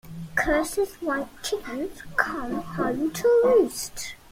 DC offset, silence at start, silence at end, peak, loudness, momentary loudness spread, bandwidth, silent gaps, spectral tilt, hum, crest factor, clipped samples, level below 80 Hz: under 0.1%; 0.05 s; 0.15 s; -4 dBFS; -25 LUFS; 12 LU; 16.5 kHz; none; -4 dB/octave; none; 20 dB; under 0.1%; -46 dBFS